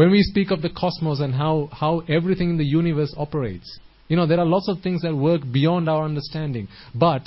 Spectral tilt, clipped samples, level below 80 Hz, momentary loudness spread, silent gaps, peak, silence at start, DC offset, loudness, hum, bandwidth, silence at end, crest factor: -11.5 dB/octave; under 0.1%; -46 dBFS; 9 LU; none; -4 dBFS; 0 s; under 0.1%; -22 LUFS; none; 5.8 kHz; 0.05 s; 18 dB